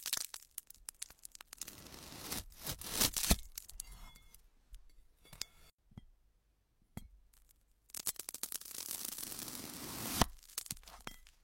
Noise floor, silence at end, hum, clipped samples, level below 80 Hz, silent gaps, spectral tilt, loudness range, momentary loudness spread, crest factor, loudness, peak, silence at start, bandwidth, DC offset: -75 dBFS; 0.15 s; none; under 0.1%; -52 dBFS; 5.74-5.78 s; -2 dB/octave; 16 LU; 21 LU; 32 dB; -40 LUFS; -12 dBFS; 0 s; 16.5 kHz; under 0.1%